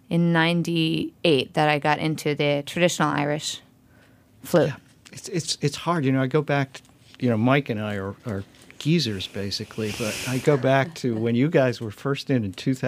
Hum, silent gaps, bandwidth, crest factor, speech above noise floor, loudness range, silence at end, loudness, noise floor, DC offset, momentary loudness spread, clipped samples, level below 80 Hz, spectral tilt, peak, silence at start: none; none; 15.5 kHz; 20 dB; 32 dB; 3 LU; 0 s; -24 LUFS; -55 dBFS; under 0.1%; 11 LU; under 0.1%; -62 dBFS; -5.5 dB/octave; -4 dBFS; 0.1 s